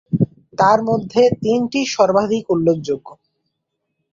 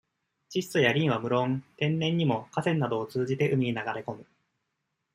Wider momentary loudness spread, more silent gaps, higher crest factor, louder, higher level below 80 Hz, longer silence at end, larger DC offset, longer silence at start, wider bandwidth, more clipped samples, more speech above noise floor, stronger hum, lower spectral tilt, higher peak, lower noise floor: second, 7 LU vs 10 LU; neither; about the same, 16 dB vs 20 dB; first, -17 LUFS vs -28 LUFS; first, -54 dBFS vs -68 dBFS; about the same, 1 s vs 0.9 s; neither; second, 0.1 s vs 0.5 s; second, 7.6 kHz vs 15.5 kHz; neither; first, 59 dB vs 54 dB; neither; about the same, -6 dB/octave vs -6.5 dB/octave; first, -2 dBFS vs -8 dBFS; second, -75 dBFS vs -81 dBFS